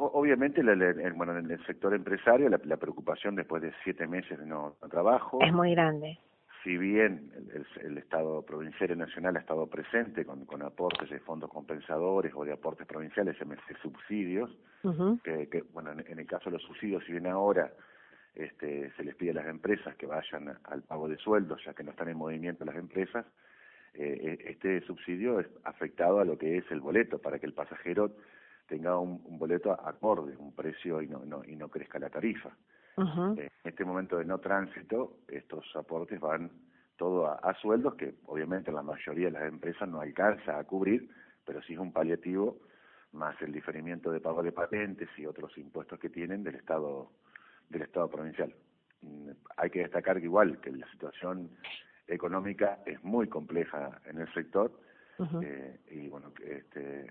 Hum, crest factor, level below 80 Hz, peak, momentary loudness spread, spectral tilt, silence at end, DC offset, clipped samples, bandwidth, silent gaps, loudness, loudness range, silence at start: none; 26 dB; -72 dBFS; -6 dBFS; 16 LU; -10 dB/octave; 0 s; under 0.1%; under 0.1%; 4.4 kHz; none; -33 LUFS; 8 LU; 0 s